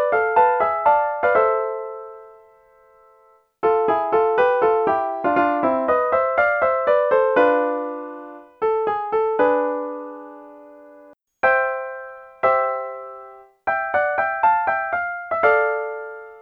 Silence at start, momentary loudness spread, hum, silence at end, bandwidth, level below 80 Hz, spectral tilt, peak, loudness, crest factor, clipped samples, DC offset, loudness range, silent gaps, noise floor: 0 s; 16 LU; none; 0 s; 5.2 kHz; -60 dBFS; -7 dB/octave; -4 dBFS; -20 LUFS; 16 dB; under 0.1%; under 0.1%; 5 LU; none; -56 dBFS